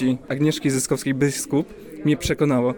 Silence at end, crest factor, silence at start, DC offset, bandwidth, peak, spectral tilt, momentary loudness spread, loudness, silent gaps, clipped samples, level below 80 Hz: 0 s; 14 dB; 0 s; under 0.1%; 18 kHz; -8 dBFS; -5.5 dB/octave; 4 LU; -22 LUFS; none; under 0.1%; -44 dBFS